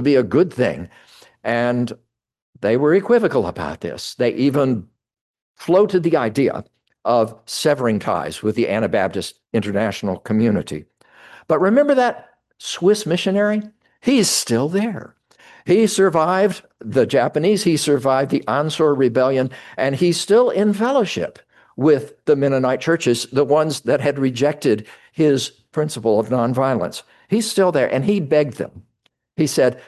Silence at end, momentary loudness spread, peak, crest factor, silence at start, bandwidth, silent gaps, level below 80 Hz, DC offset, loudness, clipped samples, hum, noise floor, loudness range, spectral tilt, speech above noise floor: 0.05 s; 11 LU; -4 dBFS; 14 dB; 0 s; 12.5 kHz; 2.42-2.53 s, 5.21-5.34 s, 5.42-5.55 s; -54 dBFS; under 0.1%; -18 LUFS; under 0.1%; none; -66 dBFS; 3 LU; -5.5 dB/octave; 48 dB